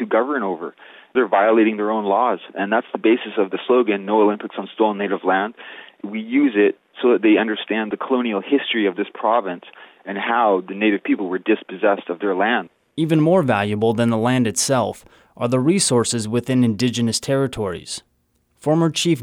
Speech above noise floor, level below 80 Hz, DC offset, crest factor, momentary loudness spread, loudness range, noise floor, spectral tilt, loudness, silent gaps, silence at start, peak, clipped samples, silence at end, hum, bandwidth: 46 dB; -60 dBFS; under 0.1%; 14 dB; 11 LU; 2 LU; -65 dBFS; -5 dB/octave; -19 LUFS; none; 0 s; -6 dBFS; under 0.1%; 0 s; none; 15.5 kHz